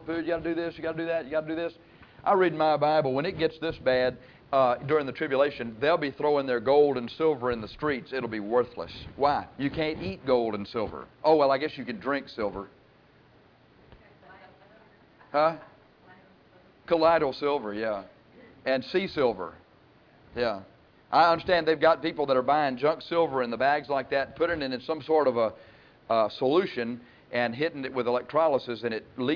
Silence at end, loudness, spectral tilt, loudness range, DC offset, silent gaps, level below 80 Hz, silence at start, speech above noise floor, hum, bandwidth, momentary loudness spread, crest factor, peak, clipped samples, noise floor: 0 s; -27 LUFS; -7.5 dB/octave; 7 LU; under 0.1%; none; -58 dBFS; 0 s; 32 dB; none; 5.4 kHz; 11 LU; 18 dB; -10 dBFS; under 0.1%; -58 dBFS